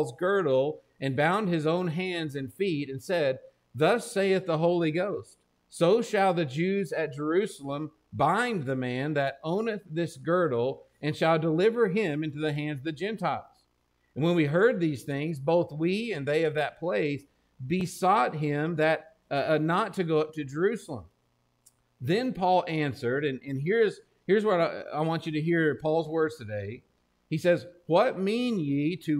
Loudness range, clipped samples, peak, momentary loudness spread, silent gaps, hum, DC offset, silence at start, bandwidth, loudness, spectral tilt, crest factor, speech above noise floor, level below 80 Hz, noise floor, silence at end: 2 LU; under 0.1%; -10 dBFS; 9 LU; none; none; under 0.1%; 0 s; 15.5 kHz; -28 LUFS; -6.5 dB/octave; 16 dB; 44 dB; -68 dBFS; -72 dBFS; 0 s